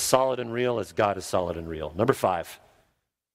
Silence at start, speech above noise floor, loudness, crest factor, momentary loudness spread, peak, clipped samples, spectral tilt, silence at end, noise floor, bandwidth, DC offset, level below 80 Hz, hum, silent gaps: 0 s; 49 dB; -27 LUFS; 26 dB; 9 LU; 0 dBFS; under 0.1%; -4.5 dB/octave; 0.8 s; -74 dBFS; 16 kHz; under 0.1%; -56 dBFS; none; none